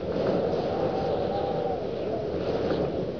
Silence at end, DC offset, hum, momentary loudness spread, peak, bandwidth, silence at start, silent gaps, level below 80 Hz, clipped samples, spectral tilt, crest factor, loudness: 0 s; 0.3%; none; 4 LU; -14 dBFS; 5.4 kHz; 0 s; none; -48 dBFS; under 0.1%; -8 dB/octave; 12 dB; -28 LUFS